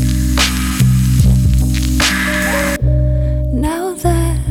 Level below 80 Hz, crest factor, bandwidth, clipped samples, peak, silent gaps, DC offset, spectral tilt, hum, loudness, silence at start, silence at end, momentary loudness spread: -18 dBFS; 12 dB; 17.5 kHz; under 0.1%; 0 dBFS; none; under 0.1%; -5 dB/octave; none; -14 LUFS; 0 s; 0 s; 5 LU